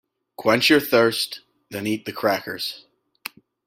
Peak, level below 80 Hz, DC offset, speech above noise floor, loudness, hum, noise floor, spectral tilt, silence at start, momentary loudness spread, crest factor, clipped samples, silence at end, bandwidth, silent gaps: -4 dBFS; -64 dBFS; under 0.1%; 20 dB; -21 LUFS; none; -41 dBFS; -4 dB/octave; 0.4 s; 21 LU; 20 dB; under 0.1%; 0.9 s; 16.5 kHz; none